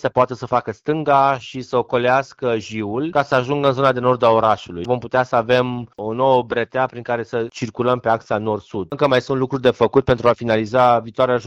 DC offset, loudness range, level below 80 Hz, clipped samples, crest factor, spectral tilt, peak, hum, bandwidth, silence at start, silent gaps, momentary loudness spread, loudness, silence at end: under 0.1%; 3 LU; -50 dBFS; under 0.1%; 16 dB; -6.5 dB/octave; -2 dBFS; none; 8.2 kHz; 0.05 s; none; 9 LU; -19 LUFS; 0 s